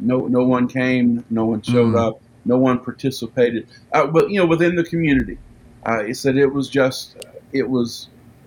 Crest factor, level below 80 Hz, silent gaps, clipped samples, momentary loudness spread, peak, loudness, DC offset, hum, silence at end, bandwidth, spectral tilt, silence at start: 16 dB; -46 dBFS; none; under 0.1%; 12 LU; -2 dBFS; -19 LUFS; under 0.1%; none; 0.4 s; 17 kHz; -6.5 dB/octave; 0 s